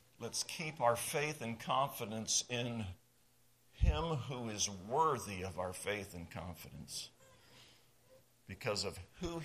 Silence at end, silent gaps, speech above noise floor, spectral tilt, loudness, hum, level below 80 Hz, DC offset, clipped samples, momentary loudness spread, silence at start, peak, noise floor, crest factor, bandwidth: 0 s; none; 32 dB; -3.5 dB/octave; -38 LUFS; none; -48 dBFS; under 0.1%; under 0.1%; 13 LU; 0.2 s; -18 dBFS; -72 dBFS; 22 dB; 15 kHz